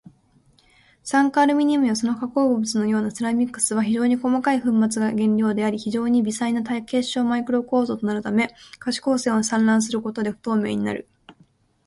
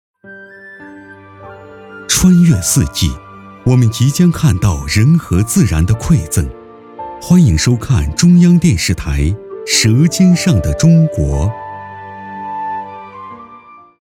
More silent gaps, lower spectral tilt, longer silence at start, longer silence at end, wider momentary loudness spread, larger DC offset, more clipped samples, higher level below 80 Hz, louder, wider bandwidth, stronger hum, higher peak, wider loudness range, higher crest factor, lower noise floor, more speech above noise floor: neither; about the same, -4.5 dB/octave vs -5.5 dB/octave; first, 1.05 s vs 0.25 s; about the same, 0.55 s vs 0.45 s; second, 6 LU vs 20 LU; neither; neither; second, -62 dBFS vs -26 dBFS; second, -22 LUFS vs -12 LUFS; second, 11.5 kHz vs 16.5 kHz; neither; second, -6 dBFS vs 0 dBFS; about the same, 2 LU vs 4 LU; about the same, 16 dB vs 12 dB; first, -59 dBFS vs -39 dBFS; first, 38 dB vs 28 dB